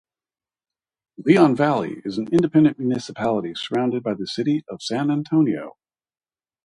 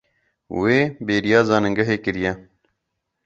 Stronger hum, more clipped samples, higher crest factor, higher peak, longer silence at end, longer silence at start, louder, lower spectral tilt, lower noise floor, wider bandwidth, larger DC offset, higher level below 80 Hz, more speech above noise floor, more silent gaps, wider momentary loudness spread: neither; neither; about the same, 20 dB vs 20 dB; about the same, -2 dBFS vs -2 dBFS; about the same, 0.95 s vs 0.85 s; first, 1.2 s vs 0.5 s; about the same, -21 LUFS vs -20 LUFS; about the same, -7 dB/octave vs -6 dB/octave; first, under -90 dBFS vs -77 dBFS; first, 11 kHz vs 7.8 kHz; neither; second, -62 dBFS vs -50 dBFS; first, over 70 dB vs 58 dB; neither; about the same, 11 LU vs 9 LU